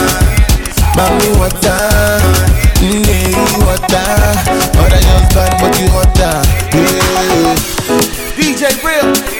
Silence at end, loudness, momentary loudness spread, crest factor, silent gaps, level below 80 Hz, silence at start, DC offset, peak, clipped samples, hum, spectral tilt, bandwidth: 0 s; -10 LUFS; 3 LU; 10 dB; none; -14 dBFS; 0 s; under 0.1%; 0 dBFS; under 0.1%; none; -4.5 dB/octave; 18 kHz